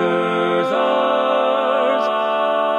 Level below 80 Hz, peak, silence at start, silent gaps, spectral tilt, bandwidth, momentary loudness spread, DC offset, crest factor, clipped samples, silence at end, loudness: -80 dBFS; -4 dBFS; 0 s; none; -5.5 dB/octave; 11 kHz; 1 LU; under 0.1%; 12 dB; under 0.1%; 0 s; -18 LUFS